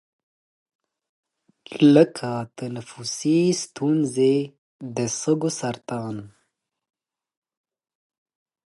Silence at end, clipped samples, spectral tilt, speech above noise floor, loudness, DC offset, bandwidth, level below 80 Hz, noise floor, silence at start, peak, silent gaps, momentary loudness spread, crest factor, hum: 2.35 s; under 0.1%; -5.5 dB/octave; 54 dB; -22 LUFS; under 0.1%; 11.5 kHz; -70 dBFS; -76 dBFS; 1.7 s; -2 dBFS; 4.58-4.79 s; 17 LU; 22 dB; none